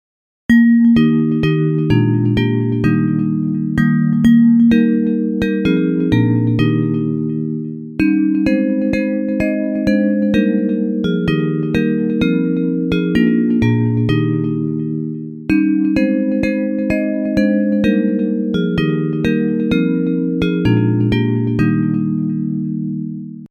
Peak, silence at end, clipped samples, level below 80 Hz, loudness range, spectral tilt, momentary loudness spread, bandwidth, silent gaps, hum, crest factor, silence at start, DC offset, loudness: -2 dBFS; 0.05 s; under 0.1%; -40 dBFS; 3 LU; -9 dB/octave; 7 LU; 7 kHz; none; none; 14 dB; 0.5 s; under 0.1%; -16 LUFS